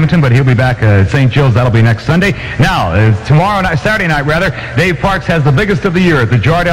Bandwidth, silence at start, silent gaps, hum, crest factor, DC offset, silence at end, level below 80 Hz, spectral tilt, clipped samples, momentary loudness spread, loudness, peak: 13 kHz; 0 s; none; none; 8 dB; under 0.1%; 0 s; -28 dBFS; -7 dB/octave; under 0.1%; 3 LU; -10 LUFS; -2 dBFS